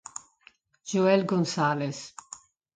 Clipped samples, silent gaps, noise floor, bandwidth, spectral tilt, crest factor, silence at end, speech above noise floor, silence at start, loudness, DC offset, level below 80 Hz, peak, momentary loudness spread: under 0.1%; none; -60 dBFS; 9.4 kHz; -5.5 dB/octave; 20 dB; 0.65 s; 35 dB; 0.85 s; -26 LUFS; under 0.1%; -72 dBFS; -10 dBFS; 22 LU